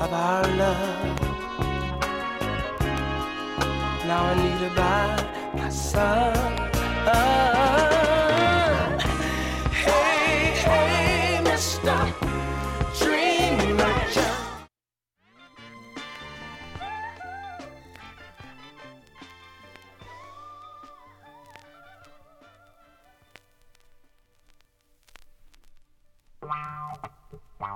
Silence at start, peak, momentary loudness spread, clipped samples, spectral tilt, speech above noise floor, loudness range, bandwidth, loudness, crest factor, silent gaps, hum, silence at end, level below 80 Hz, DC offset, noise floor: 0 s; -6 dBFS; 24 LU; under 0.1%; -4.5 dB/octave; 66 dB; 20 LU; 16.5 kHz; -23 LUFS; 20 dB; none; none; 0 s; -36 dBFS; under 0.1%; -89 dBFS